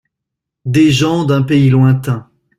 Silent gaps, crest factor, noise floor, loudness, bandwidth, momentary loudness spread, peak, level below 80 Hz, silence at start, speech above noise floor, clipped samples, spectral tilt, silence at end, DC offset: none; 12 dB; -79 dBFS; -12 LUFS; 13 kHz; 11 LU; -2 dBFS; -46 dBFS; 0.65 s; 68 dB; under 0.1%; -7 dB/octave; 0.35 s; under 0.1%